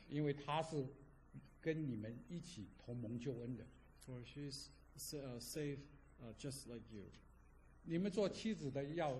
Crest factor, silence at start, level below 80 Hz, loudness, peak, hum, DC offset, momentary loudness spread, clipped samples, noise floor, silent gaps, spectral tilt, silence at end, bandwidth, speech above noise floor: 18 dB; 0 s; -66 dBFS; -46 LUFS; -28 dBFS; none; under 0.1%; 19 LU; under 0.1%; -66 dBFS; none; -6 dB/octave; 0 s; 13 kHz; 20 dB